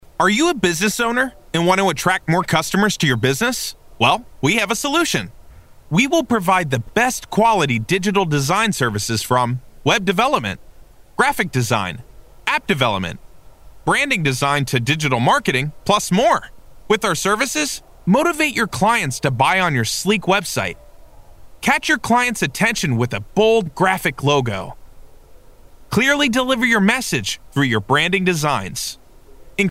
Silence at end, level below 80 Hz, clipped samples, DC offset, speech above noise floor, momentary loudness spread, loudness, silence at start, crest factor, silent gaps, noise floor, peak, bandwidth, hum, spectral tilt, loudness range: 0 s; -44 dBFS; under 0.1%; under 0.1%; 25 dB; 7 LU; -18 LUFS; 0.2 s; 18 dB; none; -43 dBFS; 0 dBFS; 16 kHz; none; -4 dB/octave; 2 LU